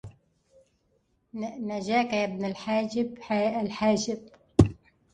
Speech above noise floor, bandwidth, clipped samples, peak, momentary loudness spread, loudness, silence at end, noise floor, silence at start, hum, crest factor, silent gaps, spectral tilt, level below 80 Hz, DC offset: 43 dB; 10 kHz; under 0.1%; -4 dBFS; 12 LU; -28 LUFS; 0.4 s; -71 dBFS; 0.05 s; none; 26 dB; none; -6 dB/octave; -44 dBFS; under 0.1%